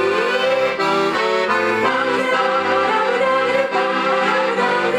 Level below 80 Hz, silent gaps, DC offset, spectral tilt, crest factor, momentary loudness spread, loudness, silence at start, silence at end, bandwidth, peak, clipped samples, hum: -60 dBFS; none; under 0.1%; -4 dB/octave; 14 dB; 1 LU; -17 LUFS; 0 s; 0 s; 12.5 kHz; -4 dBFS; under 0.1%; none